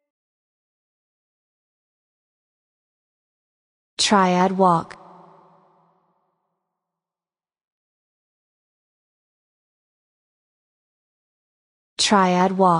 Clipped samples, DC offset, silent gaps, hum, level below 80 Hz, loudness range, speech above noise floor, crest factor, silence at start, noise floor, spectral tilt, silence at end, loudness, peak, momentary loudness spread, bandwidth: under 0.1%; under 0.1%; 7.67-11.97 s; none; -68 dBFS; 5 LU; over 73 dB; 22 dB; 4 s; under -90 dBFS; -4.5 dB/octave; 0 s; -18 LUFS; -4 dBFS; 21 LU; 10 kHz